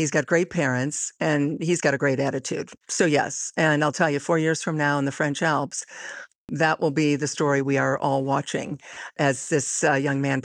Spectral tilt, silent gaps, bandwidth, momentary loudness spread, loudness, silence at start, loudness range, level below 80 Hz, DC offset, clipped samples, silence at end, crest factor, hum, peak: -4.5 dB/octave; 6.35-6.48 s; 11.5 kHz; 9 LU; -23 LUFS; 0 s; 1 LU; -68 dBFS; under 0.1%; under 0.1%; 0.05 s; 18 dB; none; -6 dBFS